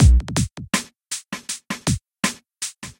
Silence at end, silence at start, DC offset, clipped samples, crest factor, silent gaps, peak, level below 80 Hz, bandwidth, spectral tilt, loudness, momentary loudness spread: 0.1 s; 0 s; under 0.1%; under 0.1%; 18 dB; none; -2 dBFS; -24 dBFS; 16.5 kHz; -4 dB/octave; -24 LUFS; 10 LU